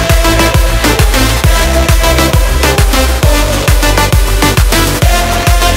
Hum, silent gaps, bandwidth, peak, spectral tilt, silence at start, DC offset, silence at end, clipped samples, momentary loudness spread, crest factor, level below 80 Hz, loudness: none; none; 16.5 kHz; 0 dBFS; -4 dB/octave; 0 s; under 0.1%; 0 s; 0.5%; 2 LU; 8 dB; -10 dBFS; -9 LUFS